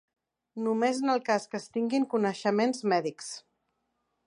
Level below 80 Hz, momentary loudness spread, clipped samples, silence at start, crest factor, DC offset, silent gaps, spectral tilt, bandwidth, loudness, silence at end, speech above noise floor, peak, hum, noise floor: -84 dBFS; 13 LU; under 0.1%; 0.55 s; 18 dB; under 0.1%; none; -5 dB/octave; 11 kHz; -29 LUFS; 0.85 s; 50 dB; -12 dBFS; none; -79 dBFS